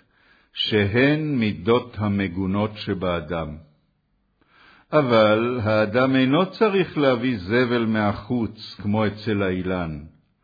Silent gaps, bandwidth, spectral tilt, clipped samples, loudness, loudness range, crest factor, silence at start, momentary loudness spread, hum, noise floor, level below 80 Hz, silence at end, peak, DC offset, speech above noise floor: none; 5 kHz; -8.5 dB/octave; under 0.1%; -22 LUFS; 6 LU; 16 dB; 0.55 s; 10 LU; none; -68 dBFS; -50 dBFS; 0.35 s; -6 dBFS; under 0.1%; 47 dB